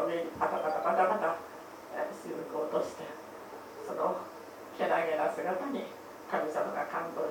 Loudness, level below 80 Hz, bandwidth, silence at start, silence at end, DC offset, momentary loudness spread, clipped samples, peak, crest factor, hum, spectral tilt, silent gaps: -33 LUFS; -74 dBFS; over 20 kHz; 0 s; 0 s; under 0.1%; 17 LU; under 0.1%; -16 dBFS; 18 dB; none; -5 dB/octave; none